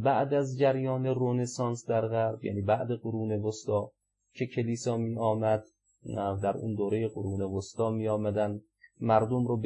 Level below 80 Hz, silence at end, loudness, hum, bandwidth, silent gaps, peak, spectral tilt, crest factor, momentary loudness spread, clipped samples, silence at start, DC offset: -70 dBFS; 0 s; -30 LUFS; none; 10.5 kHz; none; -10 dBFS; -7 dB/octave; 20 dB; 7 LU; under 0.1%; 0 s; under 0.1%